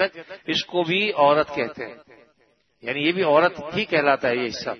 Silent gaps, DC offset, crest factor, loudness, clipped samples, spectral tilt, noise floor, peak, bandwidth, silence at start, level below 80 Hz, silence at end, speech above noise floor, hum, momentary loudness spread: none; under 0.1%; 20 dB; -21 LUFS; under 0.1%; -5 dB/octave; -64 dBFS; -4 dBFS; 6.4 kHz; 0 s; -64 dBFS; 0 s; 42 dB; none; 13 LU